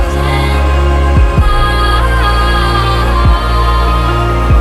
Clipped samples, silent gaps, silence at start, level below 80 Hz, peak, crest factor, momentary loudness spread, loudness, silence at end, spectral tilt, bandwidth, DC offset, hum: under 0.1%; none; 0 s; -12 dBFS; 0 dBFS; 8 dB; 2 LU; -11 LUFS; 0 s; -6 dB/octave; 12.5 kHz; under 0.1%; none